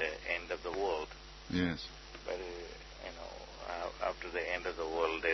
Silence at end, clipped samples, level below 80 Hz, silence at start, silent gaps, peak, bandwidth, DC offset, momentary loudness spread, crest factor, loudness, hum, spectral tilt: 0 s; under 0.1%; -54 dBFS; 0 s; none; -18 dBFS; 6.2 kHz; under 0.1%; 12 LU; 22 dB; -39 LUFS; none; -3 dB/octave